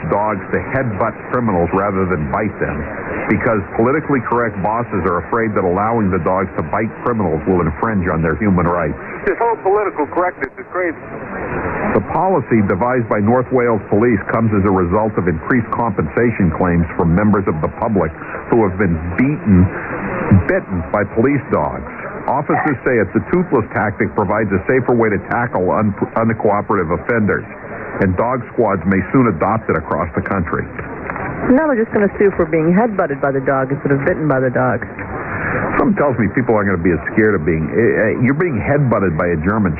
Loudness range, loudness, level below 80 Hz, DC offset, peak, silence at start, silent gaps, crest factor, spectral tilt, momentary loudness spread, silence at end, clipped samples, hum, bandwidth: 2 LU; -16 LUFS; -38 dBFS; under 0.1%; 0 dBFS; 0 s; none; 16 dB; -12.5 dB/octave; 7 LU; 0 s; under 0.1%; none; 3.2 kHz